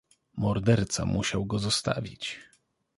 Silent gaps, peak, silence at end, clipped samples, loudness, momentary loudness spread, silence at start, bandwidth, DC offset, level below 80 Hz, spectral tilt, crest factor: none; -8 dBFS; 0.55 s; under 0.1%; -28 LUFS; 12 LU; 0.35 s; 11.5 kHz; under 0.1%; -48 dBFS; -5 dB/octave; 20 dB